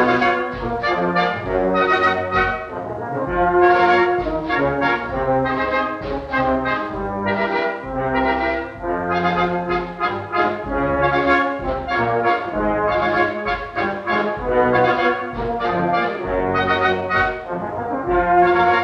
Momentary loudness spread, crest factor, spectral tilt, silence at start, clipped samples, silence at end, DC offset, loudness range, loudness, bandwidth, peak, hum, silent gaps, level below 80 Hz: 9 LU; 16 dB; -7 dB/octave; 0 s; under 0.1%; 0 s; under 0.1%; 3 LU; -19 LUFS; 7.2 kHz; -2 dBFS; none; none; -38 dBFS